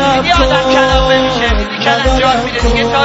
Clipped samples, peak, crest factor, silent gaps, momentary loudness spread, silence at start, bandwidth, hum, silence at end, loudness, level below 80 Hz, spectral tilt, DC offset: under 0.1%; 0 dBFS; 10 dB; none; 4 LU; 0 s; 8 kHz; none; 0 s; -11 LUFS; -20 dBFS; -4.5 dB/octave; under 0.1%